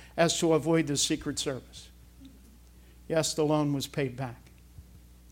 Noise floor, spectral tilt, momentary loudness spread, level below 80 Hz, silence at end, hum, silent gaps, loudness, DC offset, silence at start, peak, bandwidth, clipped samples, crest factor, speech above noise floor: -54 dBFS; -4 dB/octave; 14 LU; -54 dBFS; 0.35 s; none; none; -28 LUFS; under 0.1%; 0 s; -8 dBFS; 16.5 kHz; under 0.1%; 22 dB; 26 dB